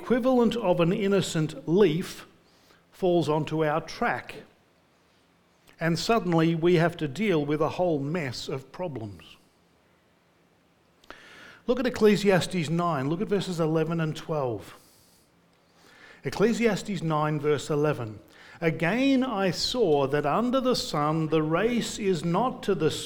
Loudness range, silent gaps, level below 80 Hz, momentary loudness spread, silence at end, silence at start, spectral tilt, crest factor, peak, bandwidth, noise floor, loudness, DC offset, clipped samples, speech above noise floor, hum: 6 LU; none; -54 dBFS; 12 LU; 0 s; 0 s; -6 dB/octave; 18 dB; -8 dBFS; 18.5 kHz; -64 dBFS; -26 LUFS; under 0.1%; under 0.1%; 38 dB; none